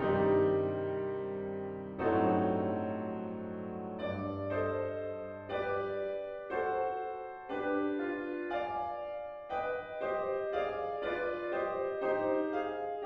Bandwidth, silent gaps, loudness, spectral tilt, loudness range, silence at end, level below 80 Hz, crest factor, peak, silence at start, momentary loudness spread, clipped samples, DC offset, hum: 5.2 kHz; none; -35 LUFS; -9 dB/octave; 3 LU; 0 s; -64 dBFS; 18 dB; -18 dBFS; 0 s; 10 LU; under 0.1%; under 0.1%; none